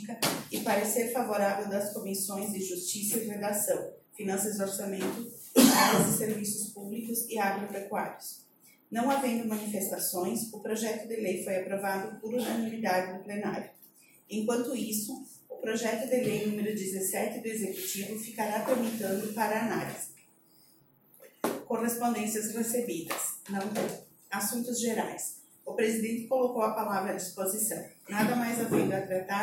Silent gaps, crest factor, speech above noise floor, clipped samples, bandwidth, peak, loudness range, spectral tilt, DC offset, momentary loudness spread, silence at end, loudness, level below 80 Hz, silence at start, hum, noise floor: none; 26 dB; 32 dB; under 0.1%; 17 kHz; -6 dBFS; 6 LU; -3.5 dB/octave; under 0.1%; 9 LU; 0 s; -31 LUFS; -74 dBFS; 0 s; none; -63 dBFS